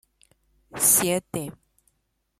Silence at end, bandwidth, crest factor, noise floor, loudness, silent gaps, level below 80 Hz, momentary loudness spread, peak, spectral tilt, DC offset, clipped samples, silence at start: 0.9 s; 16 kHz; 22 dB; -74 dBFS; -21 LUFS; none; -62 dBFS; 21 LU; -6 dBFS; -2.5 dB/octave; under 0.1%; under 0.1%; 0.75 s